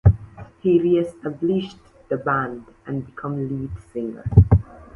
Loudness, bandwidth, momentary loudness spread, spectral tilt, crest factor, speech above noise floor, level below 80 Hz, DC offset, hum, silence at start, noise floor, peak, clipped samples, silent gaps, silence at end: -22 LUFS; 4.3 kHz; 14 LU; -10 dB/octave; 20 dB; 18 dB; -32 dBFS; under 0.1%; none; 0.05 s; -39 dBFS; 0 dBFS; under 0.1%; none; 0.15 s